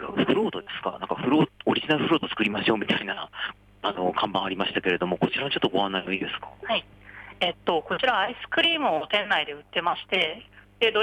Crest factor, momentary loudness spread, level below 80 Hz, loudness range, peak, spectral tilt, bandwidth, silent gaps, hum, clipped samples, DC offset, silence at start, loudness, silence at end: 16 dB; 9 LU; -60 dBFS; 2 LU; -10 dBFS; -6 dB/octave; 9.8 kHz; none; none; under 0.1%; under 0.1%; 0 s; -25 LUFS; 0 s